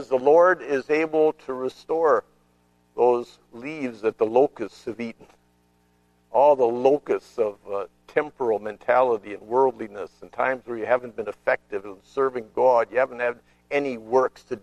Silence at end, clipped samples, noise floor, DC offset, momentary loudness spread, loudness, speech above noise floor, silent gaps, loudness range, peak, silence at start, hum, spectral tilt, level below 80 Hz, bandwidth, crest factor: 0.05 s; under 0.1%; -63 dBFS; under 0.1%; 15 LU; -23 LUFS; 40 dB; none; 3 LU; -4 dBFS; 0 s; 60 Hz at -60 dBFS; -6 dB/octave; -64 dBFS; 9.6 kHz; 20 dB